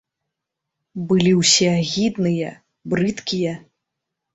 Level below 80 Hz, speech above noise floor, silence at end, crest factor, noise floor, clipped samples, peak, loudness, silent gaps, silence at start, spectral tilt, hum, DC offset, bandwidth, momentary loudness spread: -56 dBFS; 63 dB; 0.75 s; 18 dB; -82 dBFS; under 0.1%; -4 dBFS; -19 LUFS; none; 0.95 s; -4 dB/octave; none; under 0.1%; 8.2 kHz; 18 LU